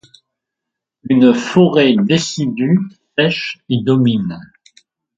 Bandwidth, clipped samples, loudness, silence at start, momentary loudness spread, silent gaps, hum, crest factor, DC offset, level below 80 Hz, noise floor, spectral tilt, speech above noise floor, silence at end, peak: 7.8 kHz; under 0.1%; -14 LUFS; 1.05 s; 10 LU; none; none; 16 dB; under 0.1%; -56 dBFS; -81 dBFS; -6 dB/octave; 68 dB; 0.75 s; 0 dBFS